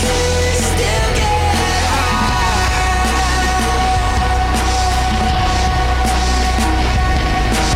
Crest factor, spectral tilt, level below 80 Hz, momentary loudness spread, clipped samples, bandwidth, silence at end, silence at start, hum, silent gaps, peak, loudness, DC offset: 8 dB; -4 dB/octave; -18 dBFS; 1 LU; under 0.1%; 16 kHz; 0 s; 0 s; none; none; -6 dBFS; -15 LUFS; under 0.1%